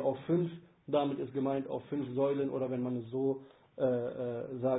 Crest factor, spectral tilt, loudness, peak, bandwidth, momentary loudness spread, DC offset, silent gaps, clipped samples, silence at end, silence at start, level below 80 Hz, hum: 16 dB; -7 dB/octave; -35 LUFS; -18 dBFS; 3.9 kHz; 6 LU; under 0.1%; none; under 0.1%; 0 s; 0 s; -72 dBFS; none